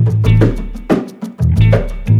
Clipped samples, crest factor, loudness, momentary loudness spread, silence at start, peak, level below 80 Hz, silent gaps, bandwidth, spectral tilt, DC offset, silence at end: under 0.1%; 12 dB; -14 LUFS; 9 LU; 0 s; 0 dBFS; -22 dBFS; none; 6.8 kHz; -9 dB/octave; under 0.1%; 0 s